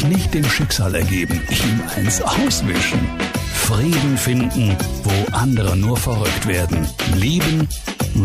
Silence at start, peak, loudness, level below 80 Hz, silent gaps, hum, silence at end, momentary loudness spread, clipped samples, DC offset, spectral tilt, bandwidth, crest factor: 0 s; -6 dBFS; -18 LUFS; -30 dBFS; none; none; 0 s; 4 LU; under 0.1%; under 0.1%; -4.5 dB/octave; 15.5 kHz; 10 dB